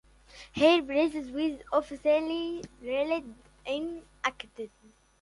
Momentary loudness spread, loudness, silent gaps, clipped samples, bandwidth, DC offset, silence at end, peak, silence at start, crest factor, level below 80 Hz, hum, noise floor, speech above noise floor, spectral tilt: 19 LU; -29 LUFS; none; under 0.1%; 11.5 kHz; under 0.1%; 0.55 s; -10 dBFS; 0.35 s; 20 dB; -60 dBFS; none; -53 dBFS; 24 dB; -4.5 dB/octave